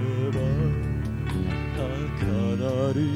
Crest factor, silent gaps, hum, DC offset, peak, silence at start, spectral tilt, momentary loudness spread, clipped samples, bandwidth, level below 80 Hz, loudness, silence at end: 12 dB; none; none; under 0.1%; -12 dBFS; 0 s; -8 dB/octave; 4 LU; under 0.1%; 12 kHz; -36 dBFS; -27 LUFS; 0 s